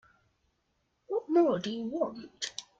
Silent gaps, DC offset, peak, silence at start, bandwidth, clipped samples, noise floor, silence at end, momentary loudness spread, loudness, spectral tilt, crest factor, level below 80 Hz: none; under 0.1%; -14 dBFS; 1.1 s; 9.2 kHz; under 0.1%; -77 dBFS; 0.2 s; 12 LU; -31 LUFS; -4.5 dB/octave; 18 dB; -74 dBFS